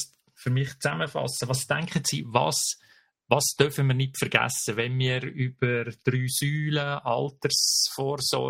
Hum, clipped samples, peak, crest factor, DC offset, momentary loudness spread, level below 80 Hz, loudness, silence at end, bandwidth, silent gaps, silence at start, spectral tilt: none; under 0.1%; -2 dBFS; 24 dB; under 0.1%; 6 LU; -62 dBFS; -26 LUFS; 0 s; 16 kHz; none; 0 s; -3.5 dB/octave